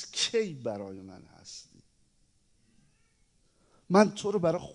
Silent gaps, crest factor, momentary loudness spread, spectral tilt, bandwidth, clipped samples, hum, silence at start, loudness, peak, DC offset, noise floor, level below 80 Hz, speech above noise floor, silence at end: none; 24 dB; 23 LU; -4.5 dB/octave; 10.5 kHz; under 0.1%; none; 0 s; -28 LUFS; -8 dBFS; under 0.1%; -68 dBFS; -70 dBFS; 39 dB; 0 s